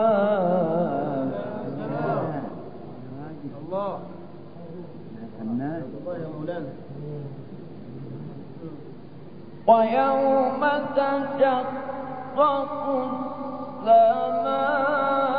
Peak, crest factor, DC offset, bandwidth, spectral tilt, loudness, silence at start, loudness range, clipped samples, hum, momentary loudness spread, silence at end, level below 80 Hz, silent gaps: -6 dBFS; 20 dB; 0.6%; 5 kHz; -11 dB/octave; -24 LUFS; 0 s; 12 LU; under 0.1%; none; 20 LU; 0 s; -74 dBFS; none